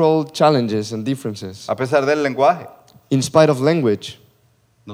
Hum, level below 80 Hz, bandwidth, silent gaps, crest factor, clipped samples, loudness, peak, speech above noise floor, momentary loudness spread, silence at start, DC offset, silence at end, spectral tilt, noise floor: none; -64 dBFS; 16 kHz; none; 18 dB; under 0.1%; -18 LUFS; 0 dBFS; 41 dB; 12 LU; 0 s; under 0.1%; 0 s; -6 dB/octave; -58 dBFS